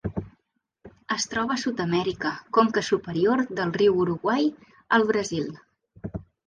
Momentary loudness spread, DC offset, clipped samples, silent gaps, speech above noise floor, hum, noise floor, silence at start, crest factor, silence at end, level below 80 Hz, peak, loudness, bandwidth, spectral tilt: 14 LU; under 0.1%; under 0.1%; none; 49 dB; none; -73 dBFS; 0.05 s; 18 dB; 0.25 s; -54 dBFS; -6 dBFS; -25 LUFS; 10 kHz; -5 dB/octave